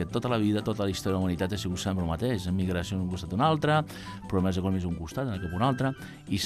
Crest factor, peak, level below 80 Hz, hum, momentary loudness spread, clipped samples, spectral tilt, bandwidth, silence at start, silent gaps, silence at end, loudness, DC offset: 16 dB; -12 dBFS; -52 dBFS; none; 7 LU; under 0.1%; -6 dB/octave; 14.5 kHz; 0 s; none; 0 s; -29 LUFS; under 0.1%